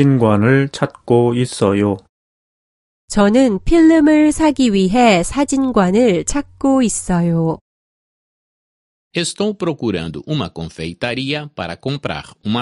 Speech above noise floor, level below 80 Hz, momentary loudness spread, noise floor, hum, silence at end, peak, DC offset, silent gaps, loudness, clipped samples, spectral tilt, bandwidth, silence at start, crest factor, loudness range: over 75 dB; -38 dBFS; 12 LU; under -90 dBFS; none; 0 s; 0 dBFS; under 0.1%; 2.09-3.08 s, 7.61-9.11 s; -15 LUFS; under 0.1%; -5.5 dB/octave; 11.5 kHz; 0 s; 16 dB; 9 LU